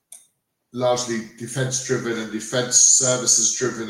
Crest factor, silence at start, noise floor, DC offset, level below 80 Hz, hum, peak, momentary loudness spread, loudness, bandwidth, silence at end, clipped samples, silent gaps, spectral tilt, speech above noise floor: 20 dB; 0.1 s; -66 dBFS; under 0.1%; -64 dBFS; none; -2 dBFS; 15 LU; -18 LUFS; 16.5 kHz; 0 s; under 0.1%; none; -2 dB/octave; 45 dB